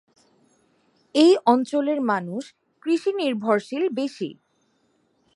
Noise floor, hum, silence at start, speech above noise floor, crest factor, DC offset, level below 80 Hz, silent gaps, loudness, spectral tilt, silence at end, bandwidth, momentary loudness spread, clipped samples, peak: -67 dBFS; none; 1.15 s; 46 dB; 20 dB; under 0.1%; -80 dBFS; none; -22 LUFS; -5.5 dB/octave; 1 s; 11.5 kHz; 17 LU; under 0.1%; -4 dBFS